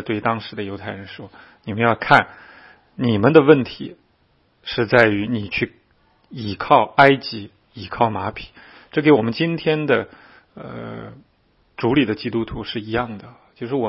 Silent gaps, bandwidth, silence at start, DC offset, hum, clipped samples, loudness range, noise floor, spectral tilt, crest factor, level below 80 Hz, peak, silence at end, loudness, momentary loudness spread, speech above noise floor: none; 7 kHz; 0 s; under 0.1%; none; under 0.1%; 6 LU; -61 dBFS; -8 dB/octave; 20 dB; -50 dBFS; 0 dBFS; 0 s; -19 LUFS; 22 LU; 42 dB